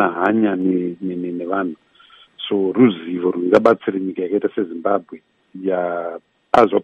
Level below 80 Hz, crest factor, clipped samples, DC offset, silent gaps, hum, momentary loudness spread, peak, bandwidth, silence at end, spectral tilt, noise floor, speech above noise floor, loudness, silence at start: -60 dBFS; 18 dB; under 0.1%; under 0.1%; none; none; 12 LU; 0 dBFS; 8 kHz; 0 s; -7.5 dB/octave; -49 dBFS; 31 dB; -19 LUFS; 0 s